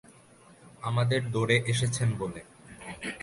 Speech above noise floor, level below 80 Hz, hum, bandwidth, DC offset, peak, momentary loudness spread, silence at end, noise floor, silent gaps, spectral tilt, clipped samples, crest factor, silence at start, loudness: 28 dB; -58 dBFS; none; 11.5 kHz; under 0.1%; -10 dBFS; 20 LU; 0 s; -56 dBFS; none; -5 dB/octave; under 0.1%; 20 dB; 0.65 s; -29 LUFS